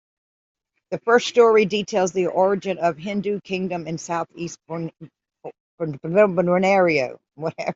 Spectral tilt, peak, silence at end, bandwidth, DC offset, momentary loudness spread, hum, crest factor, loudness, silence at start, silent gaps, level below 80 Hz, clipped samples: -5.5 dB/octave; -4 dBFS; 0 s; 7.8 kHz; under 0.1%; 16 LU; none; 18 dB; -21 LUFS; 0.9 s; 5.60-5.78 s; -66 dBFS; under 0.1%